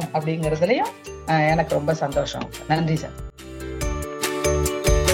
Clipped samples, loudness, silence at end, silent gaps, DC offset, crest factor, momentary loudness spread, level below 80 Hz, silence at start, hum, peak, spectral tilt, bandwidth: under 0.1%; -23 LUFS; 0 s; none; under 0.1%; 16 dB; 14 LU; -32 dBFS; 0 s; none; -6 dBFS; -5 dB/octave; 17 kHz